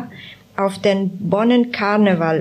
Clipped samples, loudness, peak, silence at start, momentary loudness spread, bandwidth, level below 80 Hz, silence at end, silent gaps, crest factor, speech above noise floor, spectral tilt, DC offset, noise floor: under 0.1%; -17 LUFS; -4 dBFS; 0 s; 16 LU; 12 kHz; -62 dBFS; 0 s; none; 14 dB; 23 dB; -7 dB/octave; under 0.1%; -39 dBFS